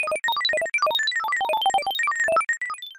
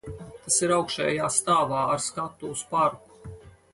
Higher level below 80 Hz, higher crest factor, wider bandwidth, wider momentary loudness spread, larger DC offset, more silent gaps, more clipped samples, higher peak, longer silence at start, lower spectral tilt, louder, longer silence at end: second, -66 dBFS vs -56 dBFS; second, 12 dB vs 20 dB; first, 16.5 kHz vs 11.5 kHz; second, 3 LU vs 21 LU; neither; neither; neither; second, -12 dBFS vs -8 dBFS; about the same, 0 s vs 0.05 s; second, 1 dB/octave vs -3 dB/octave; first, -22 LUFS vs -25 LUFS; second, 0.05 s vs 0.25 s